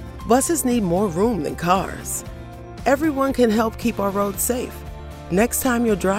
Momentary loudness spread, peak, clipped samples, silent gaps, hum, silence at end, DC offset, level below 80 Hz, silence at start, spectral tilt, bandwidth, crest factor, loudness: 15 LU; -4 dBFS; under 0.1%; none; none; 0 s; under 0.1%; -38 dBFS; 0 s; -5 dB/octave; 16 kHz; 18 dB; -21 LUFS